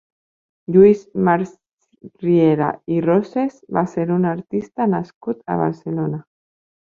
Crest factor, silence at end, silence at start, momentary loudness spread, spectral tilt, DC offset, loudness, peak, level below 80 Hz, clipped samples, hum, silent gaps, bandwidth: 18 dB; 0.6 s; 0.7 s; 13 LU; -9.5 dB/octave; under 0.1%; -19 LUFS; -2 dBFS; -58 dBFS; under 0.1%; none; 1.73-1.77 s, 5.14-5.21 s; 7.2 kHz